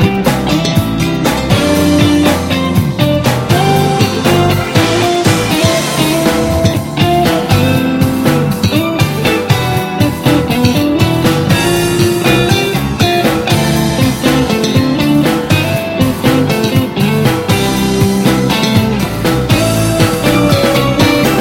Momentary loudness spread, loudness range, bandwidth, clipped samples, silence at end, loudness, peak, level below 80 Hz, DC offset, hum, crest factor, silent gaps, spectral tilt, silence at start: 3 LU; 1 LU; 17 kHz; under 0.1%; 0 s; -11 LUFS; 0 dBFS; -30 dBFS; under 0.1%; none; 10 dB; none; -5.5 dB/octave; 0 s